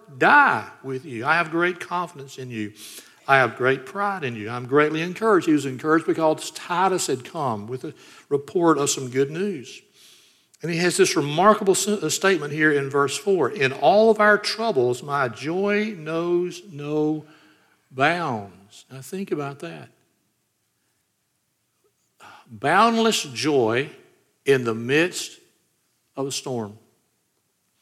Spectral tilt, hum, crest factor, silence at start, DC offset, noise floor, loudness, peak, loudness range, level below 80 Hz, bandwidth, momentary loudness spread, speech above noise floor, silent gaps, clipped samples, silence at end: -4 dB/octave; none; 22 dB; 0.1 s; under 0.1%; -72 dBFS; -22 LUFS; -2 dBFS; 9 LU; -74 dBFS; 15.5 kHz; 16 LU; 50 dB; none; under 0.1%; 1.05 s